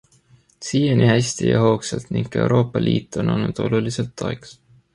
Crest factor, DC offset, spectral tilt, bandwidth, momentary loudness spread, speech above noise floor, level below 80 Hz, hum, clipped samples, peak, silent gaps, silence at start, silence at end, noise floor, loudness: 18 dB; under 0.1%; -6 dB/octave; 11.5 kHz; 10 LU; 36 dB; -48 dBFS; none; under 0.1%; -2 dBFS; none; 0.6 s; 0.4 s; -55 dBFS; -20 LUFS